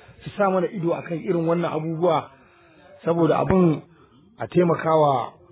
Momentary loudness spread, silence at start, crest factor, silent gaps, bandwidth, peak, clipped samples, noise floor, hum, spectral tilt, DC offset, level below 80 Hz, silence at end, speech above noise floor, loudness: 8 LU; 0.25 s; 18 dB; none; 4 kHz; -6 dBFS; under 0.1%; -52 dBFS; none; -12 dB/octave; under 0.1%; -52 dBFS; 0.2 s; 31 dB; -22 LUFS